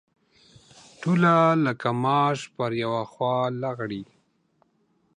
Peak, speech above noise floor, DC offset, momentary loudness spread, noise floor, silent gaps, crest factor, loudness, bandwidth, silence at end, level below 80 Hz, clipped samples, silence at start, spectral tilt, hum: -8 dBFS; 44 dB; under 0.1%; 13 LU; -67 dBFS; none; 18 dB; -24 LUFS; 10 kHz; 1.15 s; -68 dBFS; under 0.1%; 1 s; -7 dB/octave; none